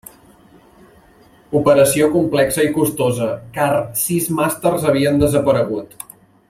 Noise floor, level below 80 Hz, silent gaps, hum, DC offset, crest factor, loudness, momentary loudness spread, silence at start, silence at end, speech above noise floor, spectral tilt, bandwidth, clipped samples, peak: -49 dBFS; -46 dBFS; none; none; under 0.1%; 16 dB; -16 LUFS; 10 LU; 1.5 s; 0.65 s; 33 dB; -5 dB/octave; 16.5 kHz; under 0.1%; 0 dBFS